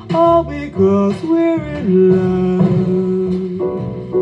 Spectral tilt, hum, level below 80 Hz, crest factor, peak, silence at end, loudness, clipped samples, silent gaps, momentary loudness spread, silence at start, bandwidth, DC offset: -9.5 dB/octave; none; -40 dBFS; 14 dB; -2 dBFS; 0 s; -15 LUFS; under 0.1%; none; 8 LU; 0 s; 7.6 kHz; under 0.1%